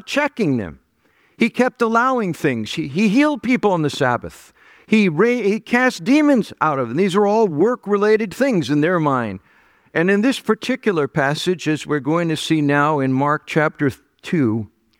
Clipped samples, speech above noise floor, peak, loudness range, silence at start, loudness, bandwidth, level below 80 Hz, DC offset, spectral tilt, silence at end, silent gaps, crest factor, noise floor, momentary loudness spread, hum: under 0.1%; 42 dB; -2 dBFS; 2 LU; 0.05 s; -18 LUFS; 16 kHz; -58 dBFS; under 0.1%; -6 dB/octave; 0.35 s; none; 16 dB; -59 dBFS; 7 LU; none